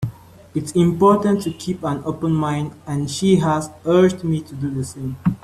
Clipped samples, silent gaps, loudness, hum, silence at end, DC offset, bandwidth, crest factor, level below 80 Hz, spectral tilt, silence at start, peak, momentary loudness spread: under 0.1%; none; -20 LUFS; none; 0.05 s; under 0.1%; 13.5 kHz; 16 dB; -50 dBFS; -7 dB/octave; 0 s; -2 dBFS; 11 LU